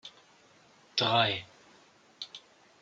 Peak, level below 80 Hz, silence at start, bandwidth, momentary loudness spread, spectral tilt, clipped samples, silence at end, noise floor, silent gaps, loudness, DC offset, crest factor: -10 dBFS; -76 dBFS; 0.05 s; 7.8 kHz; 25 LU; -4 dB/octave; under 0.1%; 0.45 s; -61 dBFS; none; -28 LUFS; under 0.1%; 24 dB